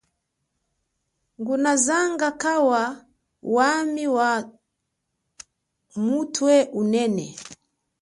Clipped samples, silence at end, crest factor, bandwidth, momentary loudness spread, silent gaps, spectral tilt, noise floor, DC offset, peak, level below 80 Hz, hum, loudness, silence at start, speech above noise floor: under 0.1%; 0.5 s; 18 dB; 11.5 kHz; 18 LU; none; -3.5 dB/octave; -78 dBFS; under 0.1%; -6 dBFS; -68 dBFS; none; -22 LUFS; 1.4 s; 57 dB